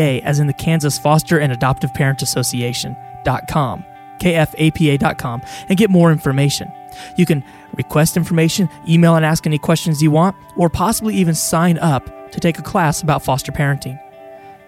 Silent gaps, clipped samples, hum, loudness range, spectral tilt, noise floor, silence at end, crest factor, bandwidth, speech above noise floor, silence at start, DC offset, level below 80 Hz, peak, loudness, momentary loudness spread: none; under 0.1%; none; 3 LU; -5.5 dB/octave; -38 dBFS; 0.15 s; 16 dB; 16 kHz; 22 dB; 0 s; under 0.1%; -42 dBFS; 0 dBFS; -16 LUFS; 10 LU